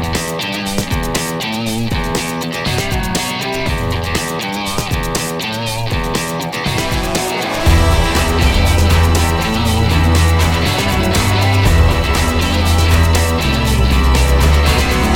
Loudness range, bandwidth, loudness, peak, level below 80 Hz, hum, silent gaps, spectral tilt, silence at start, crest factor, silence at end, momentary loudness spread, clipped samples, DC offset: 5 LU; 18 kHz; -15 LUFS; 0 dBFS; -18 dBFS; none; none; -4.5 dB/octave; 0 s; 14 dB; 0 s; 7 LU; under 0.1%; under 0.1%